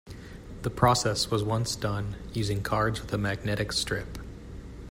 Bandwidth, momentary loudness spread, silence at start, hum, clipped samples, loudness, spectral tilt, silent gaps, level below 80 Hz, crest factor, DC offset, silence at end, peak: 16 kHz; 20 LU; 0.05 s; none; under 0.1%; -28 LUFS; -4.5 dB/octave; none; -44 dBFS; 22 dB; under 0.1%; 0 s; -8 dBFS